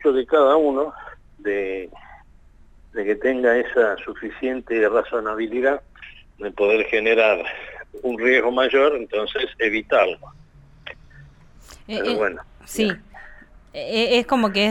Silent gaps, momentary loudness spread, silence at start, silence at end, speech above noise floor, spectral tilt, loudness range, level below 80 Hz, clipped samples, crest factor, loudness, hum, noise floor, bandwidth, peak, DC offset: none; 17 LU; 0 s; 0 s; 29 dB; -4.5 dB/octave; 6 LU; -50 dBFS; under 0.1%; 16 dB; -20 LUFS; none; -49 dBFS; 13.5 kHz; -6 dBFS; under 0.1%